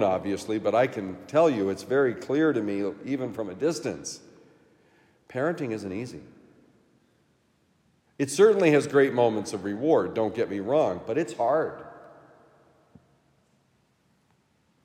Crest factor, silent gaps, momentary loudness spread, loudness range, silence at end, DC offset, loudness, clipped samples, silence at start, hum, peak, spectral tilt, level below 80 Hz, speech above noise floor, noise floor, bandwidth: 20 dB; none; 14 LU; 12 LU; 2.75 s; under 0.1%; -26 LUFS; under 0.1%; 0 s; none; -8 dBFS; -5.5 dB/octave; -72 dBFS; 42 dB; -67 dBFS; 15 kHz